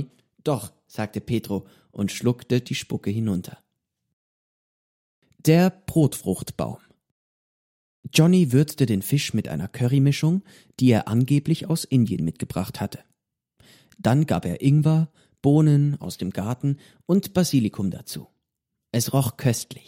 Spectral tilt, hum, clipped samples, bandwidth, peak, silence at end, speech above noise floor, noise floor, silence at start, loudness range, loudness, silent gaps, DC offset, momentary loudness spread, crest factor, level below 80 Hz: -6.5 dB/octave; none; under 0.1%; 16.5 kHz; -4 dBFS; 0.1 s; 60 dB; -82 dBFS; 0 s; 6 LU; -23 LUFS; 4.13-5.22 s, 7.11-8.03 s; under 0.1%; 13 LU; 18 dB; -56 dBFS